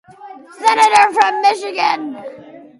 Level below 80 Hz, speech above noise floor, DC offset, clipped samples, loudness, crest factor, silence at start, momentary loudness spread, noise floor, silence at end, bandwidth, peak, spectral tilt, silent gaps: -66 dBFS; 23 dB; under 0.1%; under 0.1%; -13 LUFS; 16 dB; 0.2 s; 18 LU; -37 dBFS; 0.2 s; 11.5 kHz; 0 dBFS; -1 dB/octave; none